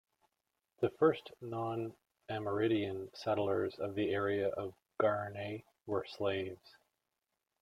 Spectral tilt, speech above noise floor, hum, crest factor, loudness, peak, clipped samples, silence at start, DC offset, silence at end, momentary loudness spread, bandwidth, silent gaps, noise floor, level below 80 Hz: -7.5 dB/octave; 52 dB; none; 20 dB; -37 LUFS; -18 dBFS; under 0.1%; 0.8 s; under 0.1%; 1.05 s; 12 LU; 14 kHz; none; -88 dBFS; -74 dBFS